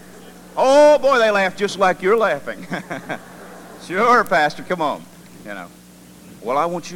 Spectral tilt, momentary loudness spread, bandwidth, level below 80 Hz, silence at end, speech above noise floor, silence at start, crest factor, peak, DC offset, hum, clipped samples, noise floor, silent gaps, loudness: -4 dB/octave; 22 LU; 16.5 kHz; -58 dBFS; 0 s; 24 dB; 0.1 s; 18 dB; -2 dBFS; under 0.1%; none; under 0.1%; -43 dBFS; none; -17 LUFS